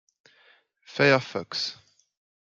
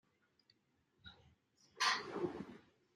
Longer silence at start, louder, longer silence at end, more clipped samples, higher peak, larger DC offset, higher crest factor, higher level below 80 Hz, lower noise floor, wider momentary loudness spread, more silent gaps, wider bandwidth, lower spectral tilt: second, 0.9 s vs 1.05 s; first, -24 LUFS vs -39 LUFS; first, 0.75 s vs 0.35 s; neither; first, -6 dBFS vs -22 dBFS; neither; about the same, 22 dB vs 24 dB; first, -72 dBFS vs -80 dBFS; second, -61 dBFS vs -79 dBFS; second, 12 LU vs 24 LU; neither; second, 7.6 kHz vs 13 kHz; first, -4.5 dB/octave vs -2 dB/octave